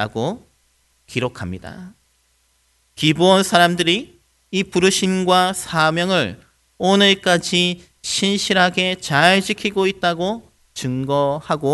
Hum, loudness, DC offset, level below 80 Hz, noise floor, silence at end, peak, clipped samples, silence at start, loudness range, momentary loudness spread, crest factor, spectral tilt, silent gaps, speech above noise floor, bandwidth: none; -17 LUFS; under 0.1%; -54 dBFS; -62 dBFS; 0 s; 0 dBFS; under 0.1%; 0 s; 3 LU; 13 LU; 18 dB; -4 dB/octave; none; 44 dB; 12 kHz